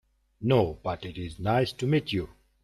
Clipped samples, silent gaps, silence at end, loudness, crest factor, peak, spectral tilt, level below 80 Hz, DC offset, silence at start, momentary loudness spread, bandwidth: under 0.1%; none; 0.35 s; -28 LUFS; 18 dB; -10 dBFS; -7 dB/octave; -52 dBFS; under 0.1%; 0.4 s; 11 LU; 13 kHz